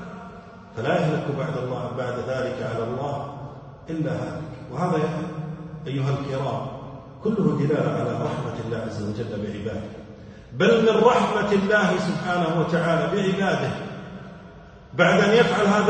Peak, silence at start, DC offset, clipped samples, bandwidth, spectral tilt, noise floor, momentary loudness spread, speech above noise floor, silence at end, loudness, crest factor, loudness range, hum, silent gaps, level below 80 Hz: -4 dBFS; 0 s; under 0.1%; under 0.1%; 9.2 kHz; -6.5 dB/octave; -44 dBFS; 20 LU; 22 dB; 0 s; -23 LUFS; 20 dB; 8 LU; none; none; -54 dBFS